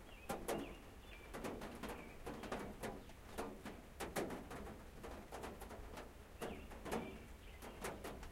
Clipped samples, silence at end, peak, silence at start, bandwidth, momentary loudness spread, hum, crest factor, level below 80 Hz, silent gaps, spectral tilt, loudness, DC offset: under 0.1%; 0 s; -28 dBFS; 0 s; 16 kHz; 10 LU; none; 22 dB; -58 dBFS; none; -4.5 dB/octave; -50 LUFS; under 0.1%